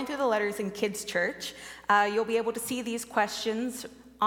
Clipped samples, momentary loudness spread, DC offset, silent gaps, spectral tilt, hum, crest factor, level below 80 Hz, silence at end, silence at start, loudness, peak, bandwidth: under 0.1%; 13 LU; under 0.1%; none; -3 dB/octave; none; 20 dB; -66 dBFS; 0 s; 0 s; -29 LUFS; -10 dBFS; 17.5 kHz